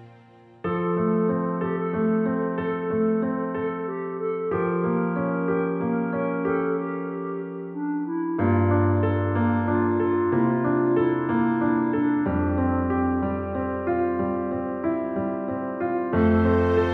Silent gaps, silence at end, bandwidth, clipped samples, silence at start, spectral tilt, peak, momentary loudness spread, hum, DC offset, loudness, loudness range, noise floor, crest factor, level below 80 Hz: none; 0 s; 4.4 kHz; under 0.1%; 0 s; -11 dB/octave; -10 dBFS; 8 LU; none; under 0.1%; -24 LUFS; 4 LU; -51 dBFS; 14 dB; -46 dBFS